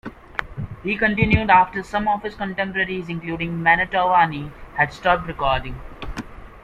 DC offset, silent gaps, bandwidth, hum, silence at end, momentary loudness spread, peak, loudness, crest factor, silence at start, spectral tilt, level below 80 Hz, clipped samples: under 0.1%; none; 10.5 kHz; none; 0.05 s; 17 LU; -2 dBFS; -20 LUFS; 20 dB; 0.05 s; -6.5 dB/octave; -38 dBFS; under 0.1%